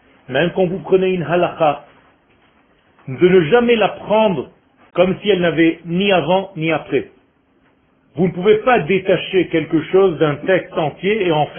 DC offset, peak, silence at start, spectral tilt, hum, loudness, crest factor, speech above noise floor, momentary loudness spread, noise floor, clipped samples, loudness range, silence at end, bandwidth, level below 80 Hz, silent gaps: under 0.1%; 0 dBFS; 0.3 s; -11.5 dB/octave; none; -16 LUFS; 16 dB; 41 dB; 9 LU; -57 dBFS; under 0.1%; 3 LU; 0 s; 3.5 kHz; -50 dBFS; none